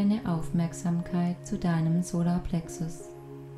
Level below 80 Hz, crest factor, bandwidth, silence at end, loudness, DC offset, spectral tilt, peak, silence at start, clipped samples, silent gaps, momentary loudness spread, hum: -46 dBFS; 12 dB; 12 kHz; 0 s; -29 LUFS; under 0.1%; -7.5 dB/octave; -16 dBFS; 0 s; under 0.1%; none; 10 LU; none